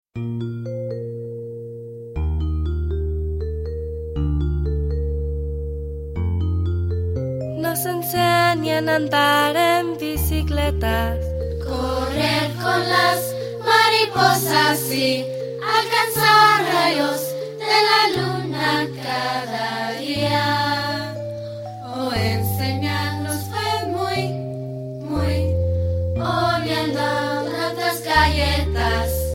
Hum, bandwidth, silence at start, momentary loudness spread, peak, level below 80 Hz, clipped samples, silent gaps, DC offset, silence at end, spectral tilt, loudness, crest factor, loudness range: none; 16.5 kHz; 0.15 s; 12 LU; -2 dBFS; -30 dBFS; under 0.1%; none; under 0.1%; 0 s; -4.5 dB/octave; -20 LUFS; 18 dB; 8 LU